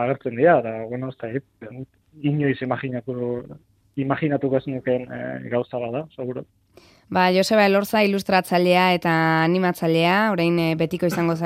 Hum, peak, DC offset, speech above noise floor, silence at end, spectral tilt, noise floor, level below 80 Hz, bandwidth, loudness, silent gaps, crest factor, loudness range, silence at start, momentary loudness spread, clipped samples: none; -4 dBFS; under 0.1%; 32 dB; 0 s; -6 dB/octave; -53 dBFS; -62 dBFS; 16 kHz; -21 LUFS; none; 18 dB; 8 LU; 0 s; 14 LU; under 0.1%